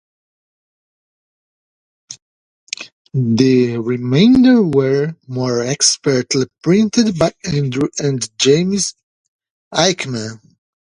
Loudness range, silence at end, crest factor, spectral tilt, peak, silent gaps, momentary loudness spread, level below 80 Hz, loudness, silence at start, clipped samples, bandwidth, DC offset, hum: 7 LU; 0.5 s; 16 dB; -4.5 dB/octave; 0 dBFS; 2.22-2.67 s, 2.92-3.05 s, 9.03-9.39 s, 9.50-9.71 s; 16 LU; -50 dBFS; -15 LUFS; 2.1 s; under 0.1%; 11 kHz; under 0.1%; none